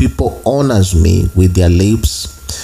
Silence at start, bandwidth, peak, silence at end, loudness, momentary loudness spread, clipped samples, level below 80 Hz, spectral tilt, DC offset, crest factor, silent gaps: 0 s; 15.5 kHz; 0 dBFS; 0 s; -12 LUFS; 7 LU; under 0.1%; -22 dBFS; -6 dB/octave; under 0.1%; 12 dB; none